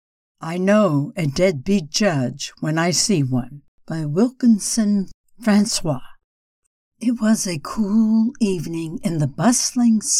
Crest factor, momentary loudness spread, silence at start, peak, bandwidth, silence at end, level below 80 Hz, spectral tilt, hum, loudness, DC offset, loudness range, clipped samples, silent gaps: 14 dB; 10 LU; 0.4 s; -4 dBFS; 15 kHz; 0 s; -48 dBFS; -4.5 dB/octave; none; -20 LUFS; under 0.1%; 2 LU; under 0.1%; 3.68-3.78 s, 5.14-5.24 s, 6.24-6.92 s